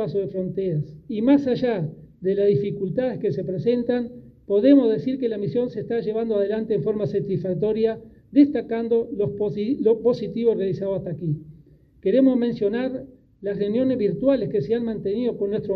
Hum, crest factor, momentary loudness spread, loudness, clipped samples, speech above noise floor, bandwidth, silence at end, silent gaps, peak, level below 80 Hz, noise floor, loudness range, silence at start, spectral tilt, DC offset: none; 18 dB; 9 LU; -23 LUFS; under 0.1%; 30 dB; 5.8 kHz; 0 s; none; -4 dBFS; -56 dBFS; -51 dBFS; 2 LU; 0 s; -10 dB/octave; under 0.1%